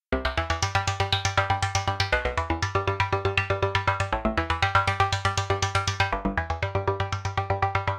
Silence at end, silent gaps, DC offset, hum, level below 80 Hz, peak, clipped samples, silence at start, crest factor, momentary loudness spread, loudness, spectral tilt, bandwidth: 0 s; none; under 0.1%; none; -38 dBFS; -6 dBFS; under 0.1%; 0.1 s; 18 dB; 4 LU; -25 LUFS; -4 dB/octave; 12 kHz